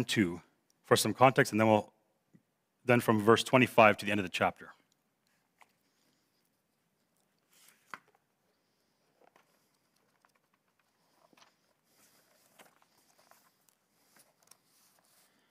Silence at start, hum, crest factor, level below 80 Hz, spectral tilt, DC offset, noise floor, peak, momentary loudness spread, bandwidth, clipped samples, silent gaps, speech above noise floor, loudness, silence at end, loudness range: 0 s; none; 24 dB; -78 dBFS; -5 dB/octave; under 0.1%; -78 dBFS; -10 dBFS; 27 LU; 16 kHz; under 0.1%; none; 51 dB; -28 LUFS; 10.85 s; 11 LU